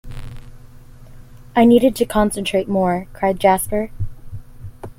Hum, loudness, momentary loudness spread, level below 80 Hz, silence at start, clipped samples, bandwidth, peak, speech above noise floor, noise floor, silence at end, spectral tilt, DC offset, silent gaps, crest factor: none; -17 LUFS; 24 LU; -36 dBFS; 0.05 s; under 0.1%; 16.5 kHz; -2 dBFS; 23 dB; -39 dBFS; 0.05 s; -5.5 dB/octave; under 0.1%; none; 18 dB